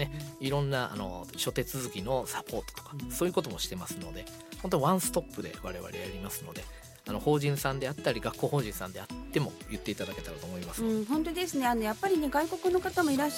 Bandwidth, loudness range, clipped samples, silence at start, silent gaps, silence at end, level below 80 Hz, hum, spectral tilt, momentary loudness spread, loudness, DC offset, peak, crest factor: 17 kHz; 3 LU; under 0.1%; 0 s; none; 0 s; -50 dBFS; none; -5 dB/octave; 12 LU; -32 LUFS; under 0.1%; -12 dBFS; 20 dB